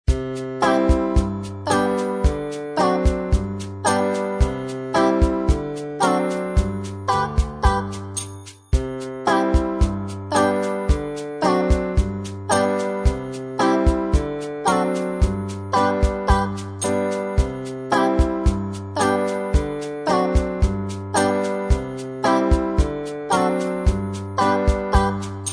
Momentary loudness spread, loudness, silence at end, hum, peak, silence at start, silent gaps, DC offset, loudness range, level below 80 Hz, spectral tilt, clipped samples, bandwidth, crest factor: 8 LU; -22 LUFS; 0 s; none; -2 dBFS; 0.1 s; none; under 0.1%; 1 LU; -26 dBFS; -6 dB/octave; under 0.1%; 11 kHz; 18 dB